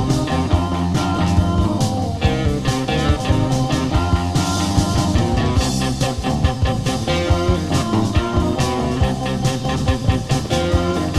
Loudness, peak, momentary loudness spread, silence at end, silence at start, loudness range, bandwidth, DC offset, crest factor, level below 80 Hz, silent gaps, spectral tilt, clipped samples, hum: -19 LUFS; 0 dBFS; 2 LU; 0 s; 0 s; 1 LU; 14 kHz; under 0.1%; 16 dB; -26 dBFS; none; -6 dB/octave; under 0.1%; none